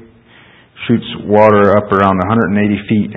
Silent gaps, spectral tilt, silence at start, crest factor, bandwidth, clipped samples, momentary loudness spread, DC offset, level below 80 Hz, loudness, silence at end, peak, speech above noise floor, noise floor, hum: none; -9 dB/octave; 0.8 s; 12 dB; 4.5 kHz; 0.2%; 8 LU; under 0.1%; -40 dBFS; -12 LUFS; 0 s; 0 dBFS; 32 dB; -43 dBFS; none